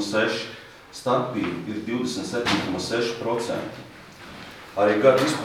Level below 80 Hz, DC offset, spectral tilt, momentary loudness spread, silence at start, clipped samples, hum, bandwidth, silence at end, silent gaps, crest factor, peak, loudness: -58 dBFS; under 0.1%; -4.5 dB/octave; 22 LU; 0 s; under 0.1%; none; 15.5 kHz; 0 s; none; 22 dB; -4 dBFS; -24 LUFS